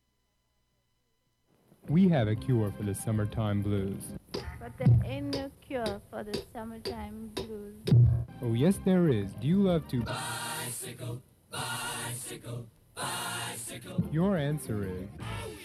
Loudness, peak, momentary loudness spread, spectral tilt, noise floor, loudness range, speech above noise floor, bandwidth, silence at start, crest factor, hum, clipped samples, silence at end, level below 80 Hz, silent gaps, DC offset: -31 LUFS; -14 dBFS; 15 LU; -6 dB/octave; -75 dBFS; 8 LU; 45 dB; 14.5 kHz; 1.85 s; 18 dB; none; under 0.1%; 0 s; -50 dBFS; none; under 0.1%